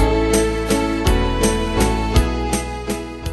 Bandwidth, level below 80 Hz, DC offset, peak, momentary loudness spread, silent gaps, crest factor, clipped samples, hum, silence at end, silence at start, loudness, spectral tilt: 12.5 kHz; -22 dBFS; under 0.1%; -2 dBFS; 8 LU; none; 16 dB; under 0.1%; none; 0 s; 0 s; -19 LUFS; -5 dB/octave